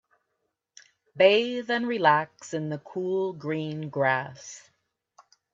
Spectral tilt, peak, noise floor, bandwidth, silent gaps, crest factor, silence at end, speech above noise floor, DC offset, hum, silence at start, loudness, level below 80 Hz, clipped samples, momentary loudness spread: -5 dB/octave; -6 dBFS; -80 dBFS; 7.8 kHz; none; 22 dB; 0.95 s; 54 dB; under 0.1%; none; 1.15 s; -26 LUFS; -76 dBFS; under 0.1%; 16 LU